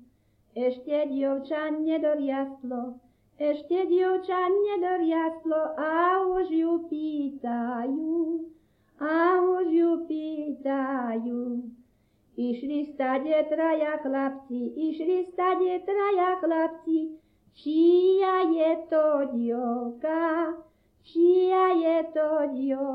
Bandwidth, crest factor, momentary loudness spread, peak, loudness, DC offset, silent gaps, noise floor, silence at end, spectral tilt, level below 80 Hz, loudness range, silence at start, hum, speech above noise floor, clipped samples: 5 kHz; 14 dB; 10 LU; -12 dBFS; -26 LUFS; under 0.1%; none; -65 dBFS; 0 s; -7.5 dB/octave; -68 dBFS; 4 LU; 0.55 s; none; 40 dB; under 0.1%